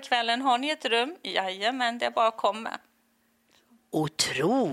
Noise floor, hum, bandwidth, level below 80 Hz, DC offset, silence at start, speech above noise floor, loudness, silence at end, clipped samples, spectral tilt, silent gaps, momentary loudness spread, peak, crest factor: -69 dBFS; none; 15.5 kHz; -72 dBFS; under 0.1%; 0 s; 42 dB; -27 LUFS; 0 s; under 0.1%; -3 dB/octave; none; 8 LU; -8 dBFS; 20 dB